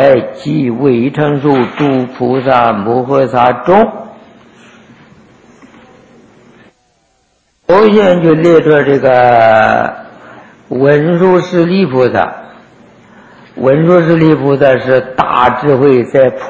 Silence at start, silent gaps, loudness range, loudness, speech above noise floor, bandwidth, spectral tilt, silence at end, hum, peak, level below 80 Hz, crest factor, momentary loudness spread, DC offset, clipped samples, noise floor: 0 s; none; 6 LU; -9 LUFS; 48 dB; 8 kHz; -8 dB/octave; 0 s; none; 0 dBFS; -46 dBFS; 10 dB; 8 LU; under 0.1%; 0.7%; -56 dBFS